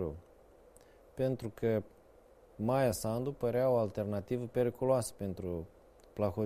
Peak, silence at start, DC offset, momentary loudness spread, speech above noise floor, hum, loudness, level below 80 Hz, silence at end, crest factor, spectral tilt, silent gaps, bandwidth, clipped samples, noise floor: -16 dBFS; 0 s; under 0.1%; 11 LU; 28 dB; none; -34 LUFS; -60 dBFS; 0 s; 18 dB; -6.5 dB/octave; none; 15.5 kHz; under 0.1%; -61 dBFS